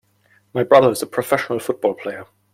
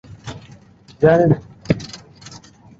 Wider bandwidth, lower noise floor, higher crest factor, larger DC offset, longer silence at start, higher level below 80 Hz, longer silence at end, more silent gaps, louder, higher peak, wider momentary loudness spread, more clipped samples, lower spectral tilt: first, 16.5 kHz vs 7.8 kHz; first, -59 dBFS vs -45 dBFS; about the same, 18 dB vs 18 dB; neither; first, 0.55 s vs 0.25 s; second, -60 dBFS vs -46 dBFS; second, 0.3 s vs 0.85 s; neither; about the same, -18 LUFS vs -17 LUFS; about the same, -2 dBFS vs -2 dBFS; second, 16 LU vs 25 LU; neither; second, -5 dB/octave vs -7.5 dB/octave